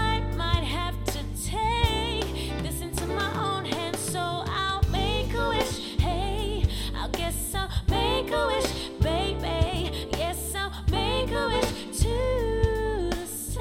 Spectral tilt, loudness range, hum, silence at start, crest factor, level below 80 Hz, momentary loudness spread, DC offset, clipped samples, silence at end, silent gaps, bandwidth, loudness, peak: -4.5 dB/octave; 1 LU; none; 0 s; 18 dB; -32 dBFS; 5 LU; under 0.1%; under 0.1%; 0 s; none; 17 kHz; -28 LUFS; -8 dBFS